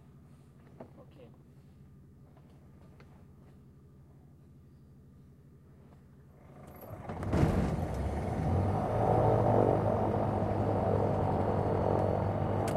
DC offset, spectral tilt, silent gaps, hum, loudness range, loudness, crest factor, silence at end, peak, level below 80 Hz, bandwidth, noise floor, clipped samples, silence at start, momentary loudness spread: under 0.1%; -9 dB/octave; none; none; 8 LU; -31 LUFS; 22 dB; 0 s; -12 dBFS; -48 dBFS; 13 kHz; -57 dBFS; under 0.1%; 0.8 s; 22 LU